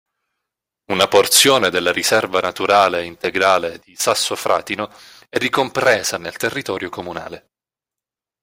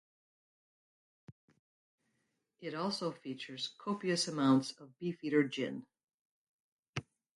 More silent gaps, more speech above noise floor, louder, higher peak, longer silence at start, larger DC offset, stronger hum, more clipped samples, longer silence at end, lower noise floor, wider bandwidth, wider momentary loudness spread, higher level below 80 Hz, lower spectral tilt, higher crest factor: second, none vs 1.32-1.48 s, 1.59-1.98 s, 6.04-6.08 s, 6.14-6.83 s, 6.89-6.93 s; first, 70 dB vs 47 dB; first, -17 LUFS vs -36 LUFS; first, 0 dBFS vs -18 dBFS; second, 0.9 s vs 1.3 s; neither; neither; neither; first, 1.05 s vs 0.35 s; first, -88 dBFS vs -82 dBFS; first, 16.5 kHz vs 11.5 kHz; about the same, 15 LU vs 15 LU; first, -58 dBFS vs -78 dBFS; second, -2 dB/octave vs -5 dB/octave; about the same, 18 dB vs 22 dB